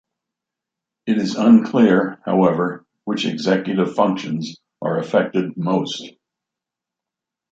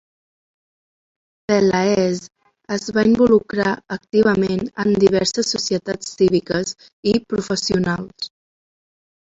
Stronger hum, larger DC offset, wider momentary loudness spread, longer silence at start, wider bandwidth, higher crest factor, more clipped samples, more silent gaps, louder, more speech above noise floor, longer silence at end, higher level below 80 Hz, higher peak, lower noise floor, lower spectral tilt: neither; neither; about the same, 14 LU vs 12 LU; second, 1.05 s vs 1.5 s; about the same, 7.8 kHz vs 8.2 kHz; about the same, 18 dB vs 18 dB; neither; second, none vs 6.93-7.03 s; about the same, -19 LUFS vs -19 LUFS; second, 68 dB vs over 72 dB; first, 1.4 s vs 1.1 s; second, -64 dBFS vs -50 dBFS; about the same, -2 dBFS vs -2 dBFS; second, -86 dBFS vs under -90 dBFS; first, -6.5 dB/octave vs -5 dB/octave